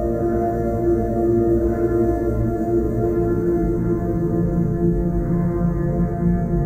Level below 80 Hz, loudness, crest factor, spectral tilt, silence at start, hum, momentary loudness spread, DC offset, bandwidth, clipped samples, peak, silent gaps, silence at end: -28 dBFS; -20 LUFS; 12 dB; -11 dB/octave; 0 s; none; 2 LU; under 0.1%; 15.5 kHz; under 0.1%; -8 dBFS; none; 0 s